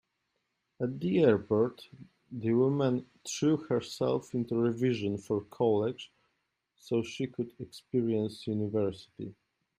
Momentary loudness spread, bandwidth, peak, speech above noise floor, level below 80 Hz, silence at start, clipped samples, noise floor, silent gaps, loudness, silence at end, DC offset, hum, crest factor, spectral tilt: 17 LU; 15 kHz; -12 dBFS; 50 dB; -70 dBFS; 0.8 s; under 0.1%; -81 dBFS; none; -31 LUFS; 0.45 s; under 0.1%; none; 20 dB; -6.5 dB/octave